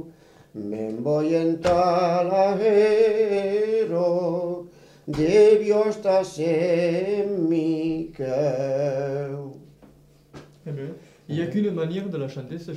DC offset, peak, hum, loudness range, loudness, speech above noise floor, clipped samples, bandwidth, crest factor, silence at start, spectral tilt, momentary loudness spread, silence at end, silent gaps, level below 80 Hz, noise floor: under 0.1%; -6 dBFS; none; 9 LU; -22 LUFS; 31 dB; under 0.1%; 10.5 kHz; 16 dB; 0 s; -7 dB/octave; 16 LU; 0 s; none; -56 dBFS; -53 dBFS